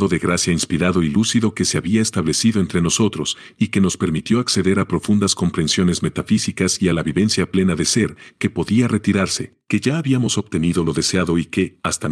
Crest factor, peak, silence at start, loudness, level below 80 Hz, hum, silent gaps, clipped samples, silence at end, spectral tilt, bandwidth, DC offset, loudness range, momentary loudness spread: 16 dB; -2 dBFS; 0 s; -18 LUFS; -44 dBFS; none; none; under 0.1%; 0 s; -4.5 dB/octave; 12.5 kHz; under 0.1%; 1 LU; 5 LU